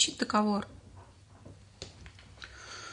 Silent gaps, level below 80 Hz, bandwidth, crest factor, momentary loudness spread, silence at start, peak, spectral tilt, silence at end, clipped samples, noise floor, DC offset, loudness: none; -60 dBFS; 10.5 kHz; 24 dB; 26 LU; 0 s; -10 dBFS; -3 dB/octave; 0 s; under 0.1%; -54 dBFS; under 0.1%; -31 LUFS